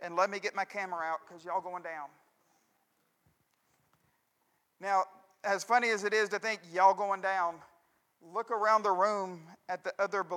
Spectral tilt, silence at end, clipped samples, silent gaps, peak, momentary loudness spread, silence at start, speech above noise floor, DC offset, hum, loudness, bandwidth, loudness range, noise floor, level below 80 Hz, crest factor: -3 dB/octave; 0 s; under 0.1%; none; -12 dBFS; 15 LU; 0 s; 45 dB; under 0.1%; none; -32 LUFS; 15 kHz; 14 LU; -76 dBFS; under -90 dBFS; 22 dB